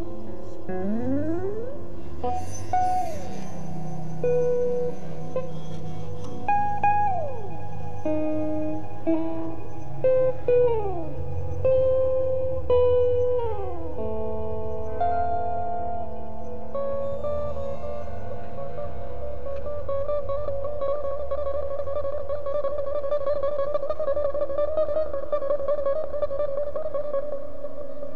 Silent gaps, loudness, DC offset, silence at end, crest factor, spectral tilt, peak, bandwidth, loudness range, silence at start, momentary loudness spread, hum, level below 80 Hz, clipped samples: none; -28 LUFS; 7%; 0 s; 14 dB; -8 dB/octave; -10 dBFS; 10.5 kHz; 7 LU; 0 s; 14 LU; none; -44 dBFS; under 0.1%